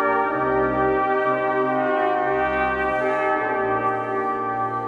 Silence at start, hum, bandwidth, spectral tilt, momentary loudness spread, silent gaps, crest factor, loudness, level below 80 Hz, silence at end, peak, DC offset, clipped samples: 0 s; none; 7.2 kHz; -7.5 dB/octave; 4 LU; none; 12 dB; -21 LUFS; -48 dBFS; 0 s; -8 dBFS; under 0.1%; under 0.1%